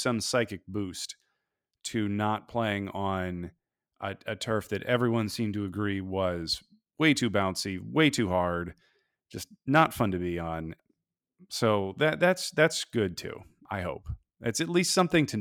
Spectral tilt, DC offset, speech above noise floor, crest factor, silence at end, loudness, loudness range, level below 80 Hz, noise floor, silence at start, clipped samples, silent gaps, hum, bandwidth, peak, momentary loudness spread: -4.5 dB/octave; under 0.1%; 55 dB; 20 dB; 0 s; -29 LUFS; 4 LU; -56 dBFS; -84 dBFS; 0 s; under 0.1%; none; none; 18.5 kHz; -8 dBFS; 15 LU